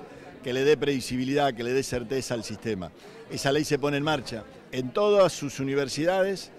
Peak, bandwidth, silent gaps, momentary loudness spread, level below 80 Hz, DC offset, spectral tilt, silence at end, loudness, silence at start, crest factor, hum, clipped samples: -10 dBFS; 14.5 kHz; none; 14 LU; -54 dBFS; under 0.1%; -5 dB/octave; 0 s; -26 LUFS; 0 s; 16 dB; none; under 0.1%